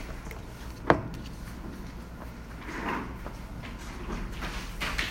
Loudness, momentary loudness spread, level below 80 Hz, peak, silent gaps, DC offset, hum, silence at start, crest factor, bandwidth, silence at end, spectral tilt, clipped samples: -35 LUFS; 16 LU; -42 dBFS; -2 dBFS; none; under 0.1%; none; 0 s; 32 dB; 16 kHz; 0 s; -5 dB/octave; under 0.1%